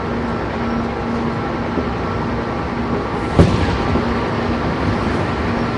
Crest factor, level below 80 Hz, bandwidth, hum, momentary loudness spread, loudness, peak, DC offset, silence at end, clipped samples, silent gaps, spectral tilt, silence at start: 18 dB; -28 dBFS; 11 kHz; none; 6 LU; -19 LUFS; 0 dBFS; under 0.1%; 0 s; under 0.1%; none; -7.5 dB/octave; 0 s